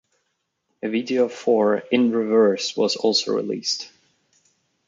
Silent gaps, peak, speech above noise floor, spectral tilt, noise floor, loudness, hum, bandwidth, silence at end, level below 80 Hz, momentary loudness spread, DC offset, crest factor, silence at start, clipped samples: none; -4 dBFS; 54 dB; -4 dB/octave; -74 dBFS; -21 LUFS; none; 7.6 kHz; 1 s; -74 dBFS; 8 LU; under 0.1%; 18 dB; 0.85 s; under 0.1%